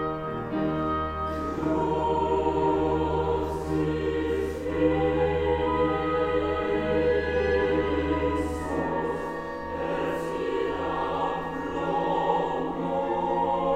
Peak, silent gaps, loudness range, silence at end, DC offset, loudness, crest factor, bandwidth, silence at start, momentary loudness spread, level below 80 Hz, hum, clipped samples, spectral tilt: -12 dBFS; none; 4 LU; 0 s; under 0.1%; -27 LUFS; 14 dB; 13 kHz; 0 s; 6 LU; -42 dBFS; none; under 0.1%; -7.5 dB/octave